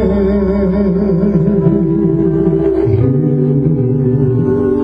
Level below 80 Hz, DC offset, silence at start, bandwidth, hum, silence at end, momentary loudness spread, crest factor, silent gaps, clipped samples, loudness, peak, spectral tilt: -28 dBFS; under 0.1%; 0 s; 5.2 kHz; none; 0 s; 1 LU; 12 dB; none; under 0.1%; -13 LUFS; 0 dBFS; -12 dB/octave